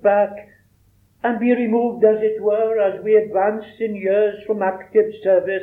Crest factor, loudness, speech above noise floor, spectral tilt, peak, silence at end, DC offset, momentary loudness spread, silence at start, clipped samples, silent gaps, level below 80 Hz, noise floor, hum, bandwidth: 16 dB; -19 LUFS; 39 dB; -8.5 dB/octave; -2 dBFS; 0 s; under 0.1%; 7 LU; 0.05 s; under 0.1%; none; -64 dBFS; -57 dBFS; none; 3.9 kHz